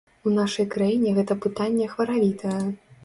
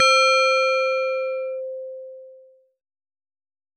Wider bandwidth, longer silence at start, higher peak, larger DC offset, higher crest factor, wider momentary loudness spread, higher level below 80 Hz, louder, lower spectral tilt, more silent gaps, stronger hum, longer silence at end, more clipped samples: about the same, 11.5 kHz vs 11.5 kHz; first, 0.25 s vs 0 s; about the same, -12 dBFS vs -12 dBFS; neither; about the same, 12 dB vs 12 dB; second, 5 LU vs 21 LU; first, -62 dBFS vs under -90 dBFS; second, -24 LUFS vs -19 LUFS; first, -6.5 dB/octave vs 6 dB/octave; neither; neither; second, 0.1 s vs 1.45 s; neither